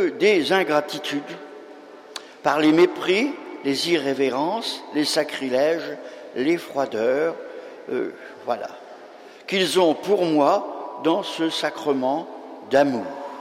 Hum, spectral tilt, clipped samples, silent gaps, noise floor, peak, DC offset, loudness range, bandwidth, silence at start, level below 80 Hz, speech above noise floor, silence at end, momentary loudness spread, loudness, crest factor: none; -4 dB/octave; under 0.1%; none; -44 dBFS; -4 dBFS; under 0.1%; 5 LU; 16 kHz; 0 s; -70 dBFS; 22 dB; 0 s; 19 LU; -22 LUFS; 18 dB